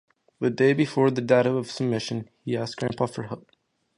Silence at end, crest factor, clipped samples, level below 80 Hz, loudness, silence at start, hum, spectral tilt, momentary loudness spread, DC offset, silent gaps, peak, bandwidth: 0.6 s; 20 dB; under 0.1%; -64 dBFS; -25 LUFS; 0.4 s; none; -6.5 dB/octave; 12 LU; under 0.1%; none; -6 dBFS; 11 kHz